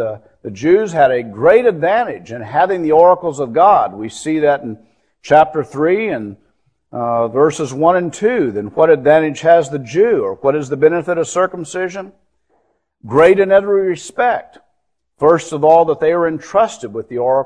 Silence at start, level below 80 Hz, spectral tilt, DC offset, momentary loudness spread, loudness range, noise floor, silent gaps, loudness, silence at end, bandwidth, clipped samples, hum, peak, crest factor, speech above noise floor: 0 s; -54 dBFS; -6 dB/octave; under 0.1%; 12 LU; 3 LU; -70 dBFS; none; -14 LUFS; 0 s; 10.5 kHz; under 0.1%; none; 0 dBFS; 14 dB; 56 dB